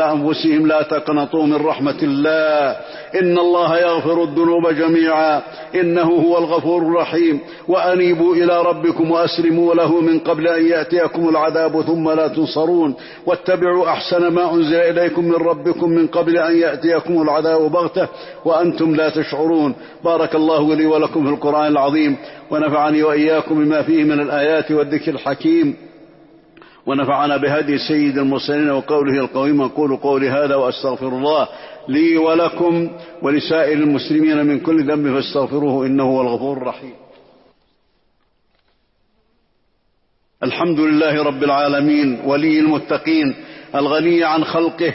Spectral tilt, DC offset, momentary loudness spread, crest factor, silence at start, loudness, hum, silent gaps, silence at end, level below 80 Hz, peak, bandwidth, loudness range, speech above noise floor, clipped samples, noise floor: -10 dB/octave; under 0.1%; 6 LU; 10 dB; 0 s; -16 LUFS; none; none; 0 s; -60 dBFS; -6 dBFS; 5.8 kHz; 4 LU; 47 dB; under 0.1%; -62 dBFS